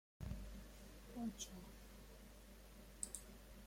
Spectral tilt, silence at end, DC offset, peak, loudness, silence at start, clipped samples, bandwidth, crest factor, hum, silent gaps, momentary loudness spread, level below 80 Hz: -4 dB/octave; 0 s; under 0.1%; -26 dBFS; -54 LUFS; 0.2 s; under 0.1%; 16.5 kHz; 28 dB; none; none; 12 LU; -60 dBFS